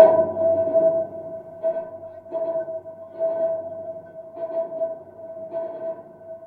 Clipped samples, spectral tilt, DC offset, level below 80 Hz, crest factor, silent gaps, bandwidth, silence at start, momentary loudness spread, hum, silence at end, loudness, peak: under 0.1%; -9.5 dB/octave; under 0.1%; -70 dBFS; 24 dB; none; 3.5 kHz; 0 s; 18 LU; none; 0 s; -25 LUFS; 0 dBFS